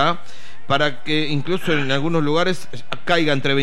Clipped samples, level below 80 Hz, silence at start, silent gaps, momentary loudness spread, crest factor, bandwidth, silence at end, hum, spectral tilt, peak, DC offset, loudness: under 0.1%; -60 dBFS; 0 s; none; 11 LU; 16 dB; 14 kHz; 0 s; none; -5.5 dB/octave; -4 dBFS; 9%; -20 LUFS